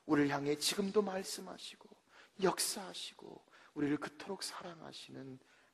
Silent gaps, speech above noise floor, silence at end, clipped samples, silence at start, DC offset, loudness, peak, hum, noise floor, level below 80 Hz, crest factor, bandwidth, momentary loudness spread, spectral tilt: none; 25 dB; 0.35 s; under 0.1%; 0.05 s; under 0.1%; -37 LUFS; -18 dBFS; none; -63 dBFS; -76 dBFS; 20 dB; 14 kHz; 20 LU; -3.5 dB/octave